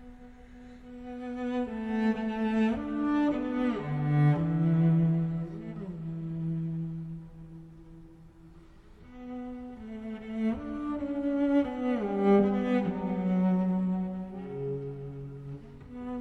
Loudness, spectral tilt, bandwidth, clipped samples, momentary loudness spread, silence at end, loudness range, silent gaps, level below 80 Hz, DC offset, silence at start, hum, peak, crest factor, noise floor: -30 LUFS; -9.5 dB/octave; 6 kHz; under 0.1%; 19 LU; 0 s; 12 LU; none; -54 dBFS; under 0.1%; 0 s; none; -12 dBFS; 18 dB; -52 dBFS